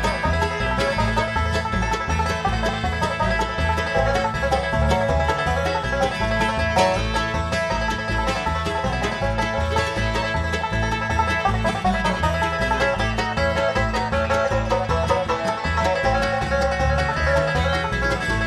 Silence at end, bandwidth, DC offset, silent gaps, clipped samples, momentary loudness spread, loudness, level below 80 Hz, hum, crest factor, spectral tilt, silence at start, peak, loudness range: 0 s; 13.5 kHz; under 0.1%; none; under 0.1%; 3 LU; -21 LUFS; -30 dBFS; none; 16 dB; -5 dB/octave; 0 s; -6 dBFS; 1 LU